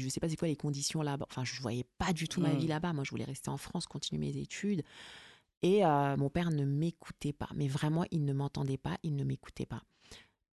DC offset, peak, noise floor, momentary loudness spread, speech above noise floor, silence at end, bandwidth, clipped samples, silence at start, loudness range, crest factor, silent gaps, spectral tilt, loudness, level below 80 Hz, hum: under 0.1%; -16 dBFS; -58 dBFS; 11 LU; 24 dB; 0.3 s; 12 kHz; under 0.1%; 0 s; 4 LU; 18 dB; 5.57-5.61 s; -6 dB/octave; -35 LUFS; -58 dBFS; none